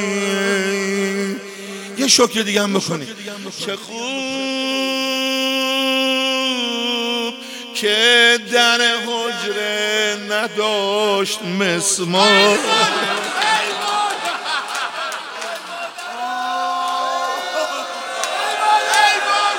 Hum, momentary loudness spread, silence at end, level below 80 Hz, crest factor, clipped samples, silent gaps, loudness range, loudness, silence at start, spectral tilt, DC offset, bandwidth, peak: none; 13 LU; 0 s; -70 dBFS; 18 dB; under 0.1%; none; 7 LU; -17 LUFS; 0 s; -2 dB/octave; under 0.1%; 17 kHz; 0 dBFS